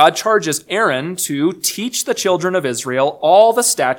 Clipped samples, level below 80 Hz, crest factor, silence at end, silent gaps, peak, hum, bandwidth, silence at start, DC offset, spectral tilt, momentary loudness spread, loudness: under 0.1%; -64 dBFS; 16 dB; 0 s; none; 0 dBFS; none; 19 kHz; 0 s; under 0.1%; -3 dB/octave; 9 LU; -15 LUFS